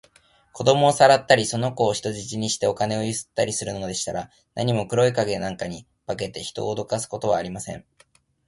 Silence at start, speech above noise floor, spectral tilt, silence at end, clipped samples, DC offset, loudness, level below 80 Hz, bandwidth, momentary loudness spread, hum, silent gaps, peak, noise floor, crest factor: 0.55 s; 35 dB; -4 dB/octave; 0.65 s; under 0.1%; under 0.1%; -23 LUFS; -54 dBFS; 11.5 kHz; 16 LU; none; none; 0 dBFS; -58 dBFS; 22 dB